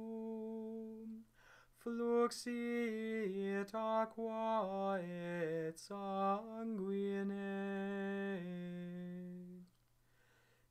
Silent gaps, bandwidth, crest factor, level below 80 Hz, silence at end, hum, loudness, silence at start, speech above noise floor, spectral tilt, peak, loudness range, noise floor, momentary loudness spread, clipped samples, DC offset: none; 15 kHz; 18 dB; -80 dBFS; 1.05 s; none; -42 LUFS; 0 s; 34 dB; -6.5 dB/octave; -24 dBFS; 5 LU; -74 dBFS; 12 LU; under 0.1%; under 0.1%